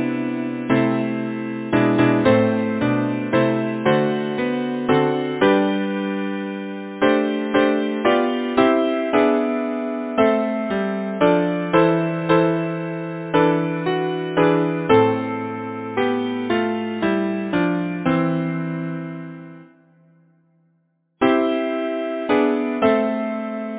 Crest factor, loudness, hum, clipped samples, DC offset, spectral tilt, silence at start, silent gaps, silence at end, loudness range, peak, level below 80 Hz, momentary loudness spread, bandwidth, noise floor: 18 dB; -20 LUFS; none; under 0.1%; under 0.1%; -10.5 dB/octave; 0 s; none; 0 s; 5 LU; -2 dBFS; -56 dBFS; 9 LU; 4 kHz; -66 dBFS